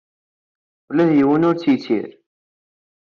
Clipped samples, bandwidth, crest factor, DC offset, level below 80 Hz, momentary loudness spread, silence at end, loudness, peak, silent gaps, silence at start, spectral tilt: under 0.1%; 6.6 kHz; 14 dB; under 0.1%; -62 dBFS; 9 LU; 1.05 s; -17 LUFS; -6 dBFS; none; 0.9 s; -6.5 dB/octave